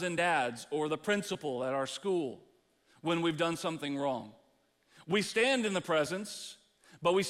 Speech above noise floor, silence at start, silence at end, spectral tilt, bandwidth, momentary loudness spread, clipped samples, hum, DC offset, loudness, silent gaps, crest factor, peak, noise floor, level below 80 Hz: 38 dB; 0 s; 0 s; -4 dB/octave; 15.5 kHz; 12 LU; under 0.1%; none; under 0.1%; -33 LUFS; none; 18 dB; -16 dBFS; -71 dBFS; -74 dBFS